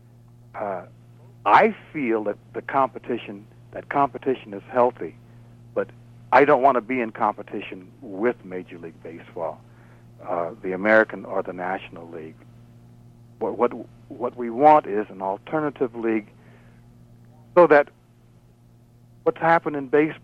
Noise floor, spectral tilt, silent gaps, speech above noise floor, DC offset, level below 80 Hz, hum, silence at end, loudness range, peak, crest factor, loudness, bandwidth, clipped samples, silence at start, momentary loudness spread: -54 dBFS; -7.5 dB/octave; none; 31 dB; under 0.1%; -62 dBFS; none; 0.05 s; 7 LU; -4 dBFS; 20 dB; -22 LUFS; 8.2 kHz; under 0.1%; 0.55 s; 22 LU